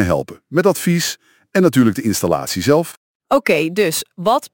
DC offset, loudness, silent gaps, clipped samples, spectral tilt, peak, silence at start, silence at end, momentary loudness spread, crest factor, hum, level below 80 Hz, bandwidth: under 0.1%; -17 LUFS; 2.97-3.20 s; under 0.1%; -5 dB/octave; 0 dBFS; 0 s; 0.05 s; 7 LU; 16 dB; none; -48 dBFS; 17 kHz